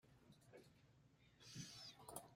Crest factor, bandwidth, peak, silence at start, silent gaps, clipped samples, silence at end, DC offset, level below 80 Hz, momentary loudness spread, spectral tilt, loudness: 26 dB; 16 kHz; -36 dBFS; 0.05 s; none; under 0.1%; 0 s; under 0.1%; -82 dBFS; 12 LU; -3 dB/octave; -59 LUFS